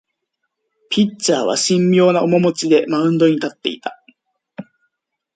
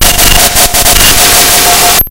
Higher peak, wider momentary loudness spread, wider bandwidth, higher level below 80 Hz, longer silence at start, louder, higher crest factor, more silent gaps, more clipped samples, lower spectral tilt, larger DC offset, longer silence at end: about the same, -2 dBFS vs 0 dBFS; first, 16 LU vs 2 LU; second, 9.4 kHz vs over 20 kHz; second, -64 dBFS vs -14 dBFS; first, 0.9 s vs 0 s; second, -16 LUFS vs -3 LUFS; first, 16 dB vs 4 dB; neither; second, under 0.1% vs 9%; first, -5 dB/octave vs -1 dB/octave; neither; first, 0.75 s vs 0 s